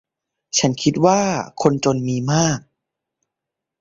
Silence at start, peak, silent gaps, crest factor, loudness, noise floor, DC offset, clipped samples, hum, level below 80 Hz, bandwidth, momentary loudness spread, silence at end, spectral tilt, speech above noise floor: 0.55 s; -2 dBFS; none; 18 dB; -19 LUFS; -84 dBFS; under 0.1%; under 0.1%; none; -54 dBFS; 7.8 kHz; 6 LU; 1.2 s; -4.5 dB/octave; 66 dB